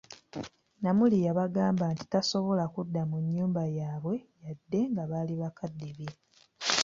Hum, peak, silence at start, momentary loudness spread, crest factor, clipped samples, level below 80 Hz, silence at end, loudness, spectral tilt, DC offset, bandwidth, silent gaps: none; -6 dBFS; 0.1 s; 16 LU; 24 dB; under 0.1%; -68 dBFS; 0 s; -30 LUFS; -5.5 dB/octave; under 0.1%; 7.8 kHz; none